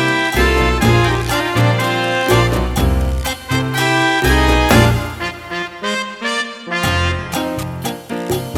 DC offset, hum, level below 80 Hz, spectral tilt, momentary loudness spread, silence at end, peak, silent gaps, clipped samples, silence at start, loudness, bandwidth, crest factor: under 0.1%; none; -24 dBFS; -5 dB/octave; 10 LU; 0 s; 0 dBFS; none; under 0.1%; 0 s; -16 LUFS; 19.5 kHz; 16 dB